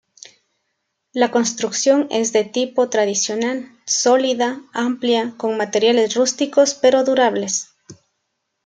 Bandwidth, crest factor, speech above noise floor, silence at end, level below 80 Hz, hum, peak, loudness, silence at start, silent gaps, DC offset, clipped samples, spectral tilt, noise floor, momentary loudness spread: 9.6 kHz; 16 dB; 57 dB; 0.7 s; -72 dBFS; none; -2 dBFS; -18 LUFS; 1.15 s; none; under 0.1%; under 0.1%; -2.5 dB/octave; -74 dBFS; 8 LU